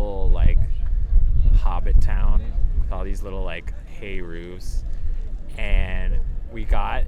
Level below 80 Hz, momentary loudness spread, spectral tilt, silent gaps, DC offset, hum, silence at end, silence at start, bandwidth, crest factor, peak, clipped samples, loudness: -18 dBFS; 12 LU; -7 dB/octave; none; under 0.1%; none; 0 s; 0 s; 3.7 kHz; 14 dB; -4 dBFS; under 0.1%; -26 LUFS